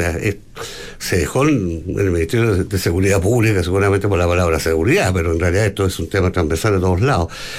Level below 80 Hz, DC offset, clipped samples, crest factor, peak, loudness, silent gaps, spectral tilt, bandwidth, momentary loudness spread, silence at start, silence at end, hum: -36 dBFS; under 0.1%; under 0.1%; 12 dB; -4 dBFS; -17 LUFS; none; -6 dB/octave; 16 kHz; 7 LU; 0 s; 0 s; none